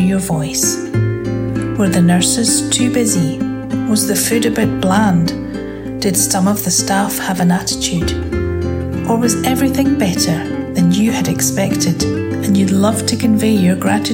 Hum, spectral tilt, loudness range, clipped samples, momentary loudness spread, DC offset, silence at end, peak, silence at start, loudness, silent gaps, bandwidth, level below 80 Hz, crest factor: none; -4.5 dB/octave; 2 LU; under 0.1%; 7 LU; under 0.1%; 0 s; 0 dBFS; 0 s; -15 LUFS; none; 17 kHz; -36 dBFS; 14 dB